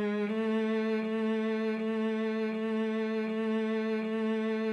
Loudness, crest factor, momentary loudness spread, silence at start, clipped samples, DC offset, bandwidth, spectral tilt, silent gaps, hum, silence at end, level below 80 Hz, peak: -31 LUFS; 10 dB; 2 LU; 0 s; under 0.1%; under 0.1%; 6.6 kHz; -7 dB/octave; none; none; 0 s; -86 dBFS; -22 dBFS